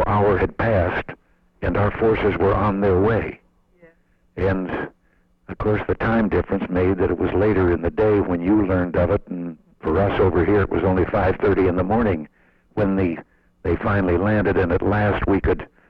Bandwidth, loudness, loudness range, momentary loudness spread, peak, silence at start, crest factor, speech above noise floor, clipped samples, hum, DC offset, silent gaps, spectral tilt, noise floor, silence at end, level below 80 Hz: 5.2 kHz; -20 LUFS; 4 LU; 10 LU; -8 dBFS; 0 s; 12 dB; 41 dB; under 0.1%; none; under 0.1%; none; -10 dB/octave; -60 dBFS; 0.25 s; -36 dBFS